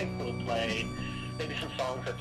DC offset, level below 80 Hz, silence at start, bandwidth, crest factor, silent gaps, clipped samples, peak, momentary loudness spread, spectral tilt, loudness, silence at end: under 0.1%; -50 dBFS; 0 s; 14 kHz; 16 dB; none; under 0.1%; -18 dBFS; 6 LU; -5 dB/octave; -34 LUFS; 0 s